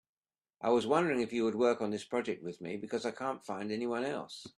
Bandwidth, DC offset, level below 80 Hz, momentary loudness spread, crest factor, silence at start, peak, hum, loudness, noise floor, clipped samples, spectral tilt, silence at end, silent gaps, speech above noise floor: 12 kHz; under 0.1%; -76 dBFS; 10 LU; 20 dB; 0.6 s; -14 dBFS; none; -34 LUFS; -68 dBFS; under 0.1%; -5.5 dB/octave; 0.1 s; none; 34 dB